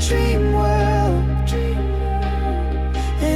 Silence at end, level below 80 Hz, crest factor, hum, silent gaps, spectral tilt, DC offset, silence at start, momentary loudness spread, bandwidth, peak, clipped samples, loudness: 0 s; -20 dBFS; 12 dB; none; none; -6.5 dB/octave; under 0.1%; 0 s; 5 LU; 13.5 kHz; -6 dBFS; under 0.1%; -20 LUFS